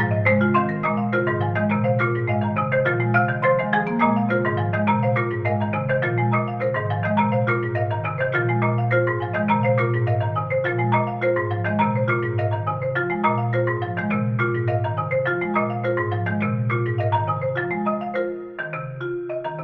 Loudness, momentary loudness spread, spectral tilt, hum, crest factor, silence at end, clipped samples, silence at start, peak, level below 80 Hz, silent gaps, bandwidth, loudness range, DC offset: -22 LUFS; 5 LU; -10.5 dB/octave; none; 16 dB; 0 s; under 0.1%; 0 s; -6 dBFS; -56 dBFS; none; 4.4 kHz; 2 LU; under 0.1%